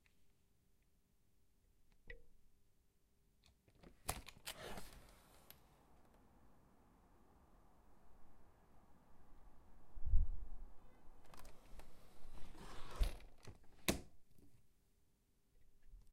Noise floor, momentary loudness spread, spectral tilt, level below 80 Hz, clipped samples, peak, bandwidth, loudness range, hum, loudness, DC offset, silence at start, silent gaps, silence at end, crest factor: -78 dBFS; 25 LU; -4 dB/octave; -50 dBFS; under 0.1%; -20 dBFS; 15.5 kHz; 19 LU; none; -48 LUFS; under 0.1%; 2.05 s; none; 0.15 s; 26 dB